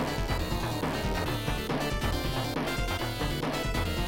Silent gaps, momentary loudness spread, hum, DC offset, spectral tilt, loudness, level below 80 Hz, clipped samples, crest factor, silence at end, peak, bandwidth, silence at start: none; 1 LU; none; under 0.1%; -5 dB/octave; -31 LUFS; -36 dBFS; under 0.1%; 12 dB; 0 s; -18 dBFS; 17 kHz; 0 s